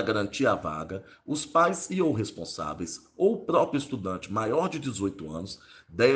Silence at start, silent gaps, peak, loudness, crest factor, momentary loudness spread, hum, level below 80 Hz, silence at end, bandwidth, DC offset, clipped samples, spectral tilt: 0 s; none; -8 dBFS; -28 LUFS; 18 dB; 14 LU; none; -60 dBFS; 0 s; 10 kHz; under 0.1%; under 0.1%; -5 dB/octave